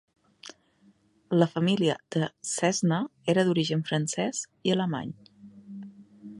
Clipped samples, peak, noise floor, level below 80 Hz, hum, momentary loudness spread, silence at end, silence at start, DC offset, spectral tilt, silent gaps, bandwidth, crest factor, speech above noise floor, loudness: under 0.1%; -8 dBFS; -63 dBFS; -72 dBFS; none; 22 LU; 0 s; 0.45 s; under 0.1%; -5 dB/octave; none; 11.5 kHz; 22 dB; 36 dB; -27 LUFS